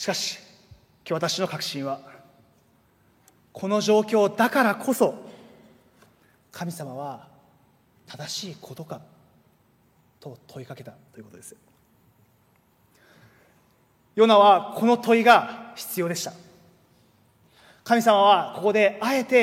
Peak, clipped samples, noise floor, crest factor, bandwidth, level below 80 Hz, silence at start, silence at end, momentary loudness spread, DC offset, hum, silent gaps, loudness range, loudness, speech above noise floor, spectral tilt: -2 dBFS; under 0.1%; -63 dBFS; 22 dB; 16.5 kHz; -72 dBFS; 0 s; 0 s; 25 LU; under 0.1%; none; none; 19 LU; -22 LUFS; 40 dB; -4 dB/octave